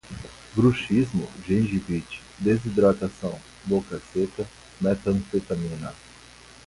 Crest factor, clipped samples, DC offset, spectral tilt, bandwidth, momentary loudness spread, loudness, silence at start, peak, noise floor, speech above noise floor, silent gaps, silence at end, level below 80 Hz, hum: 18 dB; under 0.1%; under 0.1%; -7.5 dB/octave; 11.5 kHz; 15 LU; -25 LUFS; 0.05 s; -8 dBFS; -48 dBFS; 24 dB; none; 0.7 s; -48 dBFS; none